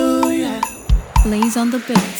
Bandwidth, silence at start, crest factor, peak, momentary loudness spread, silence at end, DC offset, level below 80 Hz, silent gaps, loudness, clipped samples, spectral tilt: 20 kHz; 0 s; 16 dB; 0 dBFS; 5 LU; 0 s; under 0.1%; -20 dBFS; none; -18 LUFS; under 0.1%; -5.5 dB/octave